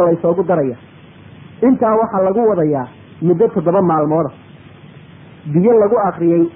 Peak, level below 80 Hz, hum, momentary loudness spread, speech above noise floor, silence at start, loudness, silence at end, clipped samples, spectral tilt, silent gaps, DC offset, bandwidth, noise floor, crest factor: -2 dBFS; -52 dBFS; none; 10 LU; 26 dB; 0 s; -15 LUFS; 0.05 s; under 0.1%; -14 dB/octave; none; under 0.1%; 3.7 kHz; -39 dBFS; 12 dB